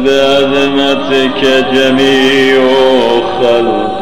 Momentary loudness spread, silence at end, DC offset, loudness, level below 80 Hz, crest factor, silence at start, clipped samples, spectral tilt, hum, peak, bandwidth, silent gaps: 3 LU; 0 s; 4%; -9 LUFS; -40 dBFS; 10 dB; 0 s; under 0.1%; -4.5 dB/octave; none; 0 dBFS; 15 kHz; none